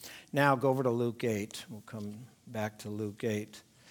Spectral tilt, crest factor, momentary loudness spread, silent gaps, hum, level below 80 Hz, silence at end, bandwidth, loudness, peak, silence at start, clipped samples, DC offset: -6 dB/octave; 22 dB; 17 LU; none; none; -76 dBFS; 0.3 s; 19.5 kHz; -33 LUFS; -10 dBFS; 0 s; under 0.1%; under 0.1%